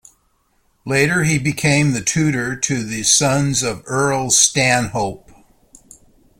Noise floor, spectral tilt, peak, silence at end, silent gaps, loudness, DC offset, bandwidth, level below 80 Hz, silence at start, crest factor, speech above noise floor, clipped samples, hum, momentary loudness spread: -62 dBFS; -3.5 dB/octave; 0 dBFS; 1.25 s; none; -16 LUFS; under 0.1%; 16.5 kHz; -48 dBFS; 0.85 s; 18 dB; 45 dB; under 0.1%; none; 8 LU